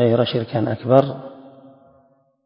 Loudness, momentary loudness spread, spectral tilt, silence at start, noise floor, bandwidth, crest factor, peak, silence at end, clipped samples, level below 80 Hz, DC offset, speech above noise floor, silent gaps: -19 LUFS; 17 LU; -9.5 dB/octave; 0 s; -58 dBFS; 5.6 kHz; 20 dB; 0 dBFS; 0.95 s; under 0.1%; -58 dBFS; under 0.1%; 40 dB; none